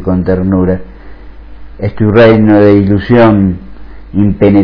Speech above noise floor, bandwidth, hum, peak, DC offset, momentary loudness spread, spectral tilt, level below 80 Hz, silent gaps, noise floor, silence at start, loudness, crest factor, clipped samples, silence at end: 21 dB; 5.4 kHz; none; 0 dBFS; under 0.1%; 14 LU; -10.5 dB/octave; -30 dBFS; none; -28 dBFS; 0 s; -8 LUFS; 8 dB; 2%; 0 s